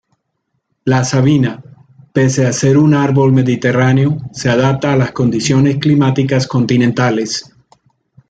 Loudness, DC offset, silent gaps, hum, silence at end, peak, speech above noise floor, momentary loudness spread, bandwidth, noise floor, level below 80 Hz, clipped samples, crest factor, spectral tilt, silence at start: -13 LUFS; under 0.1%; none; none; 0.85 s; 0 dBFS; 57 dB; 7 LU; 9 kHz; -69 dBFS; -48 dBFS; under 0.1%; 14 dB; -6 dB/octave; 0.85 s